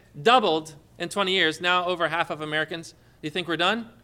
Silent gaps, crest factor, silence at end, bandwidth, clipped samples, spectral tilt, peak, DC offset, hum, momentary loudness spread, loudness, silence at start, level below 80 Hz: none; 20 dB; 0.15 s; 16 kHz; under 0.1%; -3.5 dB/octave; -6 dBFS; under 0.1%; none; 14 LU; -24 LUFS; 0.15 s; -64 dBFS